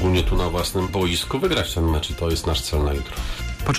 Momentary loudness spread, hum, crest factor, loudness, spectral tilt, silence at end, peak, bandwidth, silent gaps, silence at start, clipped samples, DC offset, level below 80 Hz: 6 LU; none; 10 dB; -23 LUFS; -5 dB/octave; 0 s; -12 dBFS; 15.5 kHz; none; 0 s; under 0.1%; under 0.1%; -28 dBFS